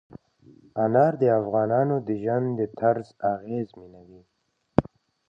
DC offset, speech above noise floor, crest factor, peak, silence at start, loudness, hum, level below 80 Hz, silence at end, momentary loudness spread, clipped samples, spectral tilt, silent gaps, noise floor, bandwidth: under 0.1%; 31 dB; 24 dB; 0 dBFS; 0.75 s; -25 LUFS; none; -56 dBFS; 0.5 s; 10 LU; under 0.1%; -10.5 dB/octave; none; -55 dBFS; 7 kHz